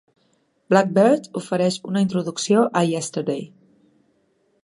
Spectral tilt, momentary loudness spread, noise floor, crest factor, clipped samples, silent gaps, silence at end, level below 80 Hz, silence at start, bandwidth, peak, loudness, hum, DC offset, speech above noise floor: -5.5 dB/octave; 9 LU; -65 dBFS; 20 dB; under 0.1%; none; 1.15 s; -70 dBFS; 0.7 s; 11.5 kHz; -2 dBFS; -20 LUFS; none; under 0.1%; 45 dB